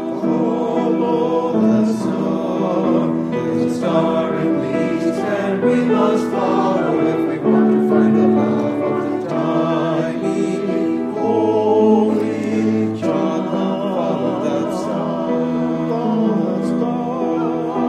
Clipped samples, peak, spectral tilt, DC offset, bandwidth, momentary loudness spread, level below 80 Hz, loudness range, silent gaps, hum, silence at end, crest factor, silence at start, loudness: under 0.1%; -2 dBFS; -7.5 dB/octave; under 0.1%; 10.5 kHz; 6 LU; -58 dBFS; 3 LU; none; none; 0 s; 14 dB; 0 s; -18 LUFS